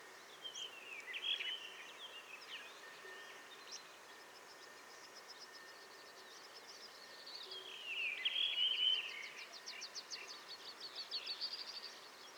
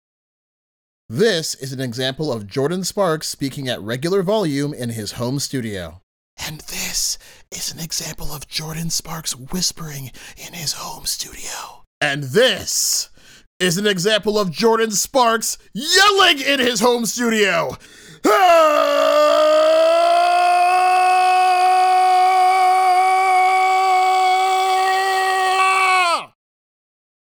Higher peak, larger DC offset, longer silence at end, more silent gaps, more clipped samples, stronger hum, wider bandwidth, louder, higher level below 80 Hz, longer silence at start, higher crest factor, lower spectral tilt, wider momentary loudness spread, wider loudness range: second, -26 dBFS vs -2 dBFS; neither; second, 0 s vs 1.1 s; second, none vs 6.03-6.37 s, 11.87-12.01 s, 13.47-13.60 s; neither; neither; about the same, over 20 kHz vs over 20 kHz; second, -42 LUFS vs -17 LUFS; second, under -90 dBFS vs -48 dBFS; second, 0 s vs 1.1 s; first, 22 dB vs 16 dB; second, 1.5 dB/octave vs -3 dB/octave; first, 20 LU vs 13 LU; first, 15 LU vs 10 LU